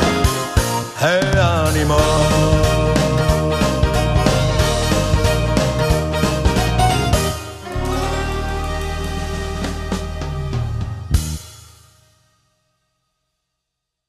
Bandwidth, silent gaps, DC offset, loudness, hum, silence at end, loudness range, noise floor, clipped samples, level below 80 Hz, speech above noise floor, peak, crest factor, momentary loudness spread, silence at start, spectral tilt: 14 kHz; none; under 0.1%; -18 LUFS; none; 2.5 s; 10 LU; -79 dBFS; under 0.1%; -24 dBFS; 64 dB; 0 dBFS; 18 dB; 10 LU; 0 s; -5 dB/octave